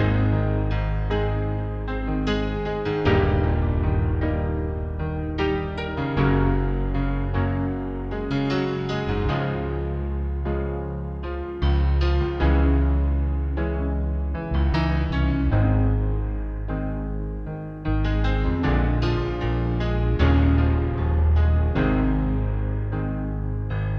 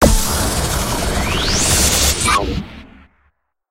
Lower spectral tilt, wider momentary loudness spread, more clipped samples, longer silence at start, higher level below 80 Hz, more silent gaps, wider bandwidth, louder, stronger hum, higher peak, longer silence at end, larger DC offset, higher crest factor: first, -9 dB/octave vs -3 dB/octave; about the same, 8 LU vs 9 LU; neither; about the same, 0 s vs 0 s; about the same, -26 dBFS vs -22 dBFS; neither; second, 6.2 kHz vs 16 kHz; second, -24 LUFS vs -15 LUFS; neither; second, -8 dBFS vs 0 dBFS; second, 0 s vs 0.85 s; neither; about the same, 14 dB vs 16 dB